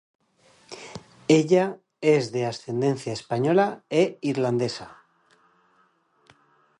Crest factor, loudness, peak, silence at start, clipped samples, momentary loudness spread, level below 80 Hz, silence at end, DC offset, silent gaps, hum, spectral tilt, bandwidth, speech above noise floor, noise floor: 22 dB; -24 LUFS; -4 dBFS; 0.7 s; under 0.1%; 19 LU; -68 dBFS; 1.9 s; under 0.1%; none; none; -6 dB/octave; 10.5 kHz; 42 dB; -65 dBFS